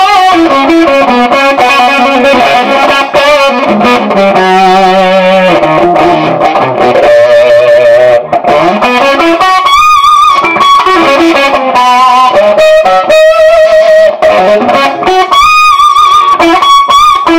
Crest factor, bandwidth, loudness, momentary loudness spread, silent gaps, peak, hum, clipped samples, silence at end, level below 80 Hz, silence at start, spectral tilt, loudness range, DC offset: 4 dB; 16.5 kHz; -4 LUFS; 3 LU; none; 0 dBFS; none; 9%; 0 s; -38 dBFS; 0 s; -4 dB/octave; 1 LU; under 0.1%